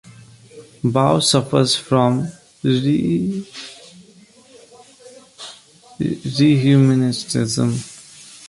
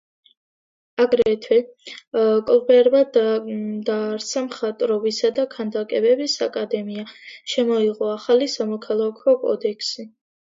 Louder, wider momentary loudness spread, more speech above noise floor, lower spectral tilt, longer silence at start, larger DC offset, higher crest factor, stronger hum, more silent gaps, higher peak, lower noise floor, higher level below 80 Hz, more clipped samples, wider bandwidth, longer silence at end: first, -17 LUFS vs -20 LUFS; first, 22 LU vs 11 LU; second, 31 dB vs over 70 dB; first, -5.5 dB/octave vs -4 dB/octave; second, 0.55 s vs 1 s; neither; about the same, 18 dB vs 16 dB; neither; second, none vs 2.07-2.11 s; about the same, -2 dBFS vs -4 dBFS; second, -48 dBFS vs under -90 dBFS; first, -54 dBFS vs -66 dBFS; neither; first, 11.5 kHz vs 7.8 kHz; second, 0 s vs 0.35 s